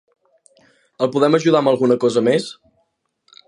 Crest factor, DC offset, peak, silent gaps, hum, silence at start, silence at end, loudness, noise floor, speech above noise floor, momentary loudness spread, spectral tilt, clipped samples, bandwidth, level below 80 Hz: 18 dB; under 0.1%; -2 dBFS; none; none; 1 s; 0.95 s; -17 LUFS; -68 dBFS; 52 dB; 7 LU; -6 dB/octave; under 0.1%; 11 kHz; -68 dBFS